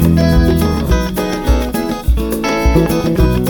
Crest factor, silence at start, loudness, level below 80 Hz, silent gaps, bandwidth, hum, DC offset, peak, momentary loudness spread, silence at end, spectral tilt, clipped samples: 12 dB; 0 s; -14 LUFS; -18 dBFS; none; over 20 kHz; none; under 0.1%; 0 dBFS; 6 LU; 0 s; -6.5 dB/octave; under 0.1%